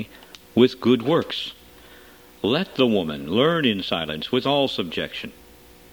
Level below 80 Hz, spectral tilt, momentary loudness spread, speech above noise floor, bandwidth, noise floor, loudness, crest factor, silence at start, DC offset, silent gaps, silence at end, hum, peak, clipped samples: -56 dBFS; -6 dB/octave; 11 LU; 27 dB; over 20 kHz; -49 dBFS; -22 LUFS; 20 dB; 0 s; under 0.1%; none; 0.6 s; none; -4 dBFS; under 0.1%